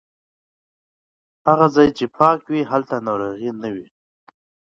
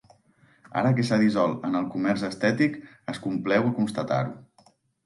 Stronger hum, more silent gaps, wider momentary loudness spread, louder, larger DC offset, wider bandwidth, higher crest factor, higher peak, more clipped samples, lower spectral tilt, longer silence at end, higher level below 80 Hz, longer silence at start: neither; neither; about the same, 13 LU vs 11 LU; first, -18 LUFS vs -25 LUFS; neither; second, 7.6 kHz vs 11.5 kHz; about the same, 20 dB vs 16 dB; first, 0 dBFS vs -10 dBFS; neither; about the same, -7 dB/octave vs -7 dB/octave; first, 0.95 s vs 0.65 s; first, -56 dBFS vs -66 dBFS; first, 1.45 s vs 0.75 s